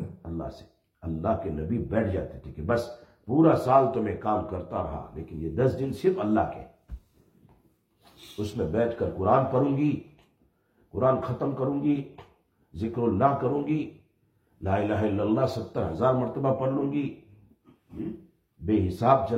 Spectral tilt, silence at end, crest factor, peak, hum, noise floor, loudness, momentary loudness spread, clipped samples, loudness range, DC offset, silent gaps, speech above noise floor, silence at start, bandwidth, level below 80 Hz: -9 dB/octave; 0 s; 20 dB; -8 dBFS; none; -68 dBFS; -27 LUFS; 16 LU; under 0.1%; 4 LU; under 0.1%; none; 42 dB; 0 s; 14 kHz; -52 dBFS